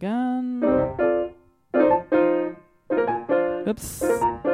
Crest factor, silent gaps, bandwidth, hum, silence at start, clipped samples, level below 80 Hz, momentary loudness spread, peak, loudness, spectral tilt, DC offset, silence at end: 16 dB; none; 16 kHz; none; 0 s; under 0.1%; -50 dBFS; 7 LU; -6 dBFS; -23 LUFS; -6 dB/octave; under 0.1%; 0 s